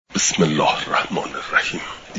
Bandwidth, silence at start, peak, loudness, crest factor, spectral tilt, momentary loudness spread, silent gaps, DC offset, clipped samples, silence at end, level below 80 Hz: 7.8 kHz; 0.1 s; -2 dBFS; -20 LUFS; 18 dB; -3 dB/octave; 8 LU; none; under 0.1%; under 0.1%; 0 s; -52 dBFS